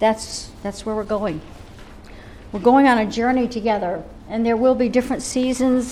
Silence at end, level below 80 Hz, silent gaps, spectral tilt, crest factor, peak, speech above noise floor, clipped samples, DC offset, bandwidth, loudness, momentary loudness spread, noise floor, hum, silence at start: 0 s; -42 dBFS; none; -5 dB/octave; 16 dB; -4 dBFS; 20 dB; under 0.1%; under 0.1%; 13 kHz; -20 LUFS; 14 LU; -40 dBFS; none; 0 s